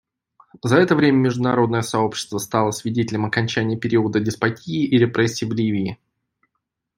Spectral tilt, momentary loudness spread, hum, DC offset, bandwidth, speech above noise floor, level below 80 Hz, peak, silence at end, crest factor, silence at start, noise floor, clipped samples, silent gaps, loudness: -6 dB/octave; 7 LU; none; under 0.1%; 16 kHz; 58 dB; -58 dBFS; -2 dBFS; 1.05 s; 18 dB; 0.65 s; -78 dBFS; under 0.1%; none; -20 LUFS